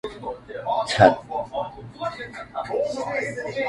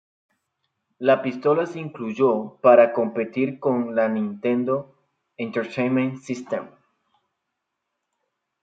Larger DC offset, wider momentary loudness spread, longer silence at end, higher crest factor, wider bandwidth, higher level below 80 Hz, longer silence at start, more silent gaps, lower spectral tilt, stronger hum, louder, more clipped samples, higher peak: neither; first, 17 LU vs 14 LU; second, 0 s vs 1.95 s; about the same, 24 dB vs 20 dB; first, 11.5 kHz vs 7.8 kHz; first, -52 dBFS vs -74 dBFS; second, 0.05 s vs 1 s; neither; second, -5 dB/octave vs -7.5 dB/octave; neither; about the same, -24 LUFS vs -22 LUFS; neither; about the same, 0 dBFS vs -2 dBFS